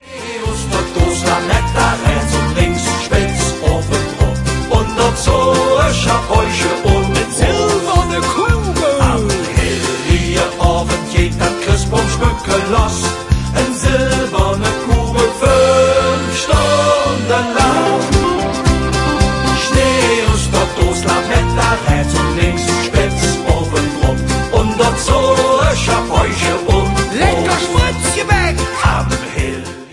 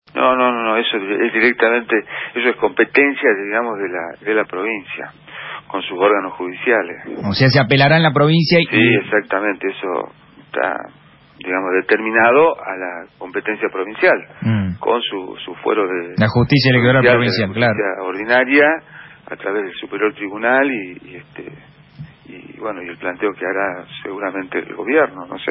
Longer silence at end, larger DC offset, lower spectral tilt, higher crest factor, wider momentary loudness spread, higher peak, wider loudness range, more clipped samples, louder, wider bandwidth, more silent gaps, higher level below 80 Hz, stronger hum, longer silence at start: about the same, 0 s vs 0 s; neither; second, -4.5 dB/octave vs -10 dB/octave; about the same, 14 dB vs 16 dB; second, 4 LU vs 16 LU; about the same, 0 dBFS vs 0 dBFS; second, 2 LU vs 8 LU; neither; about the same, -14 LUFS vs -16 LUFS; first, 11.5 kHz vs 5.8 kHz; neither; first, -22 dBFS vs -50 dBFS; neither; about the same, 0.05 s vs 0.15 s